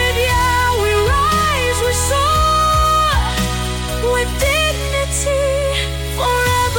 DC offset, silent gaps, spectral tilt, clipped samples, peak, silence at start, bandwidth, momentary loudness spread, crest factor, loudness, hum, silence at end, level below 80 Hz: under 0.1%; none; -3.5 dB/octave; under 0.1%; -4 dBFS; 0 s; 17 kHz; 6 LU; 12 dB; -15 LUFS; none; 0 s; -24 dBFS